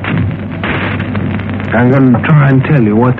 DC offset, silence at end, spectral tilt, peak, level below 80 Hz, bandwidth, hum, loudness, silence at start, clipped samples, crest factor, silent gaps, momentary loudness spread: under 0.1%; 0 s; -10.5 dB/octave; 0 dBFS; -36 dBFS; 4.3 kHz; none; -11 LUFS; 0 s; under 0.1%; 10 dB; none; 9 LU